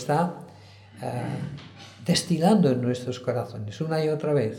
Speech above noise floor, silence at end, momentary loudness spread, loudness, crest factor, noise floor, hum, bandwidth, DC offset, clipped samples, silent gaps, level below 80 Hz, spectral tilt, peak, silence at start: 23 dB; 0 s; 16 LU; -26 LUFS; 18 dB; -48 dBFS; none; 16 kHz; under 0.1%; under 0.1%; none; -62 dBFS; -6 dB/octave; -8 dBFS; 0 s